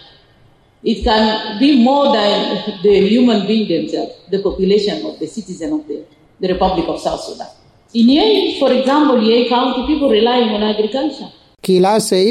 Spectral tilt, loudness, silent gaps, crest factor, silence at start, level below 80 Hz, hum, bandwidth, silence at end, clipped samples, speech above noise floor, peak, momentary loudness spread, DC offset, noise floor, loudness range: -5.5 dB/octave; -14 LUFS; none; 12 dB; 0.85 s; -40 dBFS; none; 14.5 kHz; 0 s; under 0.1%; 36 dB; -2 dBFS; 13 LU; under 0.1%; -50 dBFS; 6 LU